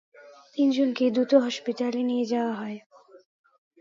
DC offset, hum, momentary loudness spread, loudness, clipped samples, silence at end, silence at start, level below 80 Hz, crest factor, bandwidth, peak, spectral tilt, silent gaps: under 0.1%; none; 14 LU; -25 LUFS; under 0.1%; 0.65 s; 0.2 s; -80 dBFS; 20 dB; 7.6 kHz; -6 dBFS; -5 dB/octave; 2.86-2.90 s